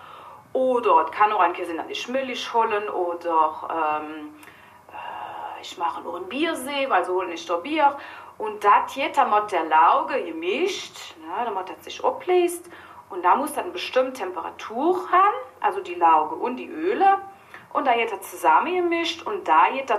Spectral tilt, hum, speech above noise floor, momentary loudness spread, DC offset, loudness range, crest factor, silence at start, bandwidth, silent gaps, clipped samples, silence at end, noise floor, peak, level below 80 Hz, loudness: -3 dB/octave; none; 21 dB; 16 LU; under 0.1%; 6 LU; 16 dB; 0 s; 15 kHz; none; under 0.1%; 0 s; -44 dBFS; -6 dBFS; -72 dBFS; -23 LUFS